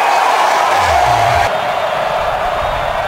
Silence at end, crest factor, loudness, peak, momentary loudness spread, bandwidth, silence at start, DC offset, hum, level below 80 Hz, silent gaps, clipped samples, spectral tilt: 0 s; 12 dB; -13 LUFS; 0 dBFS; 5 LU; 16.5 kHz; 0 s; under 0.1%; none; -34 dBFS; none; under 0.1%; -3 dB/octave